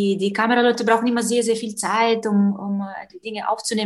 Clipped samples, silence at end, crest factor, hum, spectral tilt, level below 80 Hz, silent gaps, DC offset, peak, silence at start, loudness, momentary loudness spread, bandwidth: under 0.1%; 0 s; 16 dB; none; -4.5 dB/octave; -68 dBFS; none; under 0.1%; -4 dBFS; 0 s; -20 LUFS; 10 LU; 12.5 kHz